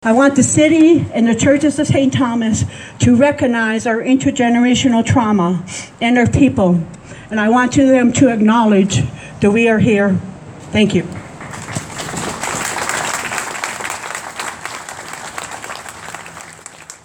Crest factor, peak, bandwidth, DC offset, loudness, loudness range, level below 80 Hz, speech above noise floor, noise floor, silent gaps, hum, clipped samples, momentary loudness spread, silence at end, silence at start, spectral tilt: 14 dB; 0 dBFS; 18 kHz; under 0.1%; -14 LUFS; 9 LU; -44 dBFS; 24 dB; -36 dBFS; none; none; under 0.1%; 17 LU; 0.1 s; 0.05 s; -5 dB/octave